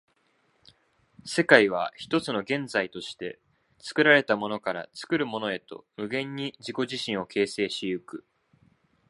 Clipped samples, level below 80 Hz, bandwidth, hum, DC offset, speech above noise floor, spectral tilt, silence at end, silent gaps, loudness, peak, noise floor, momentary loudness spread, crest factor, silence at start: under 0.1%; -70 dBFS; 11.5 kHz; none; under 0.1%; 42 dB; -4.5 dB/octave; 0.9 s; none; -26 LUFS; 0 dBFS; -69 dBFS; 18 LU; 28 dB; 1.25 s